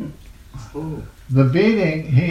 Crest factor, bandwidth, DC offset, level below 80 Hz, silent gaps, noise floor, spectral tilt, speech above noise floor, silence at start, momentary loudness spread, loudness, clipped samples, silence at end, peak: 18 dB; 7.4 kHz; under 0.1%; -42 dBFS; none; -38 dBFS; -8.5 dB/octave; 20 dB; 0 s; 19 LU; -18 LUFS; under 0.1%; 0 s; -2 dBFS